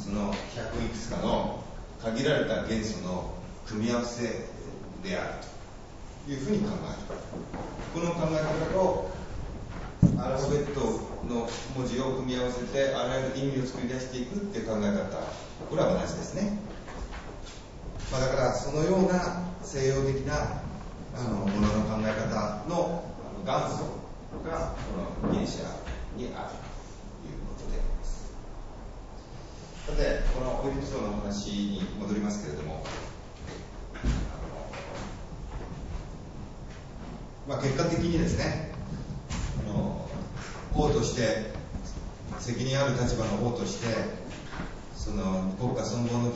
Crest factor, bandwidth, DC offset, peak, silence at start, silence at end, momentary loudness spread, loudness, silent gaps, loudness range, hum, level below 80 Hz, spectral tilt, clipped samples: 24 dB; 8 kHz; under 0.1%; -6 dBFS; 0 s; 0 s; 16 LU; -31 LUFS; none; 8 LU; none; -40 dBFS; -6 dB/octave; under 0.1%